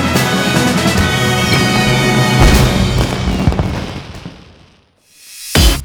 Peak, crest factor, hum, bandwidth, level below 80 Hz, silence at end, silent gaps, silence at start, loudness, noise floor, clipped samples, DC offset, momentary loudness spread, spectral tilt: 0 dBFS; 12 dB; none; over 20 kHz; -20 dBFS; 0 s; none; 0 s; -12 LUFS; -50 dBFS; under 0.1%; under 0.1%; 17 LU; -4.5 dB/octave